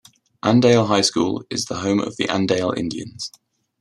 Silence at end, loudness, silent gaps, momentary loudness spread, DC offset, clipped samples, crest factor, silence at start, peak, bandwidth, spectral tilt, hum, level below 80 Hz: 0.5 s; -19 LUFS; none; 14 LU; under 0.1%; under 0.1%; 18 dB; 0.45 s; -2 dBFS; 12.5 kHz; -4.5 dB/octave; none; -60 dBFS